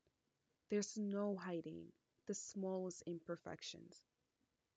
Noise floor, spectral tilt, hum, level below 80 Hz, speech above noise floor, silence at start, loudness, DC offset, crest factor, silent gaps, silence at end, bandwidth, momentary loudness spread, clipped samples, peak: -87 dBFS; -5 dB/octave; none; -88 dBFS; 42 dB; 0.7 s; -46 LUFS; under 0.1%; 18 dB; none; 0.75 s; 9 kHz; 15 LU; under 0.1%; -30 dBFS